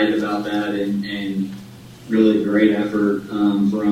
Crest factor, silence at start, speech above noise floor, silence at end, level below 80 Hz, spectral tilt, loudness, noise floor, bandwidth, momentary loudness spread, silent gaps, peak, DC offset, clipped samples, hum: 16 dB; 0 s; 21 dB; 0 s; -56 dBFS; -7 dB/octave; -19 LUFS; -39 dBFS; 14 kHz; 10 LU; none; -2 dBFS; under 0.1%; under 0.1%; none